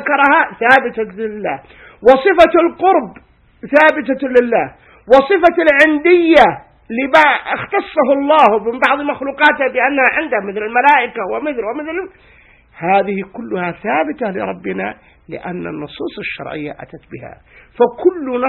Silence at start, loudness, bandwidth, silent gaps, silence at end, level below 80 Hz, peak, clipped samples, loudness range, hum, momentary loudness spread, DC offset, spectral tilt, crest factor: 0 s; -13 LUFS; 10.5 kHz; none; 0 s; -50 dBFS; 0 dBFS; 0.2%; 10 LU; none; 16 LU; under 0.1%; -6 dB/octave; 14 dB